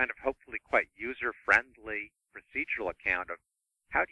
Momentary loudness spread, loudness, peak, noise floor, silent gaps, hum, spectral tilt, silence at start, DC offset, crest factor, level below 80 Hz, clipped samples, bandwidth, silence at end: 14 LU; -31 LUFS; -10 dBFS; -82 dBFS; none; none; -4.5 dB/octave; 0 s; under 0.1%; 24 dB; -58 dBFS; under 0.1%; 11 kHz; 0.05 s